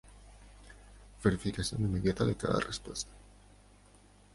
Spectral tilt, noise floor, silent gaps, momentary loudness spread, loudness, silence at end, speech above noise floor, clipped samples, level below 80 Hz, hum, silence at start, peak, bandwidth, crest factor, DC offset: -5.5 dB/octave; -60 dBFS; none; 24 LU; -33 LUFS; 1.15 s; 28 dB; under 0.1%; -50 dBFS; 50 Hz at -50 dBFS; 0.05 s; -14 dBFS; 11.5 kHz; 22 dB; under 0.1%